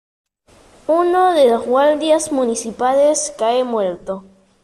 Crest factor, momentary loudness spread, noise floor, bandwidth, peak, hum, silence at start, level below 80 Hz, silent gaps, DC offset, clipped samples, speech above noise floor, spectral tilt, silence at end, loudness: 14 dB; 11 LU; -50 dBFS; 13 kHz; -4 dBFS; none; 0.9 s; -56 dBFS; none; under 0.1%; under 0.1%; 35 dB; -3 dB/octave; 0.45 s; -16 LUFS